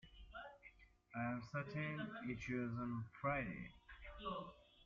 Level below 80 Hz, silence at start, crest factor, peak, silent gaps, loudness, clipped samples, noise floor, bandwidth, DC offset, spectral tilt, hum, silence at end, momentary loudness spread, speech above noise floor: -66 dBFS; 0.05 s; 20 dB; -28 dBFS; none; -46 LUFS; under 0.1%; -66 dBFS; 7.4 kHz; under 0.1%; -5.5 dB/octave; none; 0 s; 15 LU; 21 dB